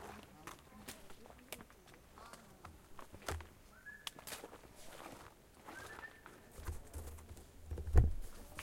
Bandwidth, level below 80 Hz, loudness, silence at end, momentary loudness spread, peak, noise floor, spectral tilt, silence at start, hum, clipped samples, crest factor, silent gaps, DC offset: 16.5 kHz; -46 dBFS; -45 LUFS; 0 s; 18 LU; -14 dBFS; -61 dBFS; -5 dB/octave; 0 s; none; under 0.1%; 30 dB; none; under 0.1%